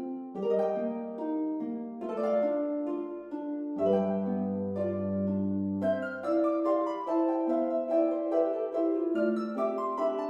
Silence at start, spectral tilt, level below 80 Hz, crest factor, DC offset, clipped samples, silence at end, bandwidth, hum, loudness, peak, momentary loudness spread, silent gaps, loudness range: 0 s; -9.5 dB/octave; -76 dBFS; 14 dB; under 0.1%; under 0.1%; 0 s; 7.2 kHz; none; -30 LUFS; -16 dBFS; 7 LU; none; 3 LU